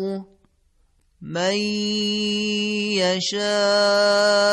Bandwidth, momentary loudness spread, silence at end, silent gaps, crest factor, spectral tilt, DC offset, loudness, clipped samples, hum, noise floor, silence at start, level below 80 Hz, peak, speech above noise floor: 12 kHz; 7 LU; 0 s; none; 12 dB; -3.5 dB/octave; under 0.1%; -20 LUFS; under 0.1%; none; -62 dBFS; 0 s; -64 dBFS; -8 dBFS; 41 dB